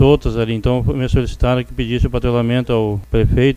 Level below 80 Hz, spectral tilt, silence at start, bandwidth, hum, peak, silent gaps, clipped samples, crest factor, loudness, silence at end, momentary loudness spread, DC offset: -24 dBFS; -8 dB/octave; 0 s; 10.5 kHz; none; 0 dBFS; none; under 0.1%; 14 dB; -17 LUFS; 0 s; 4 LU; under 0.1%